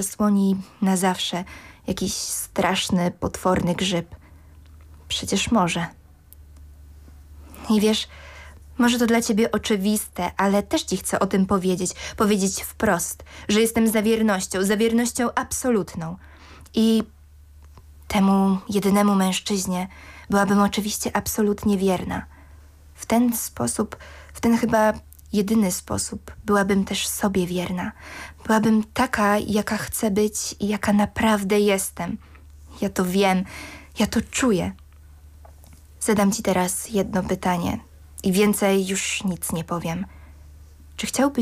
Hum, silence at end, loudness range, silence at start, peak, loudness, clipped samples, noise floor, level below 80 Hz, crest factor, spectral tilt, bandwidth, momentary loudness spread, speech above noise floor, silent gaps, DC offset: none; 0 s; 3 LU; 0 s; -8 dBFS; -22 LUFS; under 0.1%; -48 dBFS; -46 dBFS; 14 dB; -4.5 dB/octave; 16 kHz; 12 LU; 26 dB; none; under 0.1%